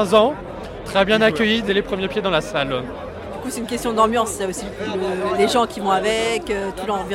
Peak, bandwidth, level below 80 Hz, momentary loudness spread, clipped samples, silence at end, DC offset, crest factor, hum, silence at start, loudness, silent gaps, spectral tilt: 0 dBFS; 16.5 kHz; -42 dBFS; 13 LU; under 0.1%; 0 s; under 0.1%; 20 dB; none; 0 s; -20 LUFS; none; -4 dB/octave